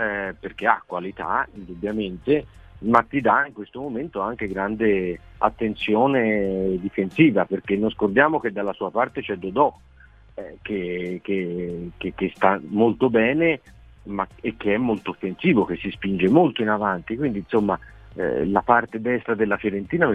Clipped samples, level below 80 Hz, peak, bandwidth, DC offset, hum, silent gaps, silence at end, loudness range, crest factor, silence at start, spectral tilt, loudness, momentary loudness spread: under 0.1%; -50 dBFS; 0 dBFS; 8 kHz; under 0.1%; none; none; 0 s; 4 LU; 22 dB; 0 s; -8.5 dB/octave; -23 LUFS; 11 LU